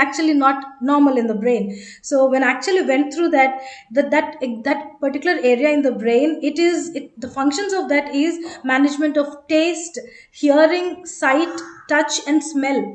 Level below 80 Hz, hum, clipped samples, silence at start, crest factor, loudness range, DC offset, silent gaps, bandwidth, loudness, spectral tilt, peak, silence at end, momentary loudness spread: -66 dBFS; none; under 0.1%; 0 s; 16 dB; 2 LU; under 0.1%; none; 9.2 kHz; -18 LUFS; -3.5 dB/octave; -2 dBFS; 0 s; 10 LU